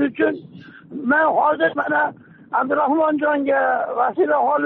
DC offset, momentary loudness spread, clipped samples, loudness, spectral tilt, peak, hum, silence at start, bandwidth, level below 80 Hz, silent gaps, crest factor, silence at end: under 0.1%; 8 LU; under 0.1%; -19 LUFS; -3.5 dB/octave; -6 dBFS; none; 0 s; 4.2 kHz; -66 dBFS; none; 12 dB; 0 s